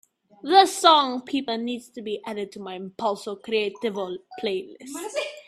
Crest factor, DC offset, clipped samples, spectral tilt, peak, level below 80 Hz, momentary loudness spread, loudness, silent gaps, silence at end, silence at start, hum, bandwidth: 24 dB; under 0.1%; under 0.1%; -3 dB/octave; -2 dBFS; -74 dBFS; 17 LU; -24 LUFS; none; 0.05 s; 0.45 s; none; 14 kHz